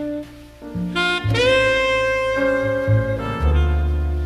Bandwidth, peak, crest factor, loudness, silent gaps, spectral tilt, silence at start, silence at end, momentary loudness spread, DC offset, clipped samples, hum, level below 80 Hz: 11.5 kHz; -6 dBFS; 14 dB; -19 LUFS; none; -6 dB/octave; 0 s; 0 s; 13 LU; under 0.1%; under 0.1%; none; -26 dBFS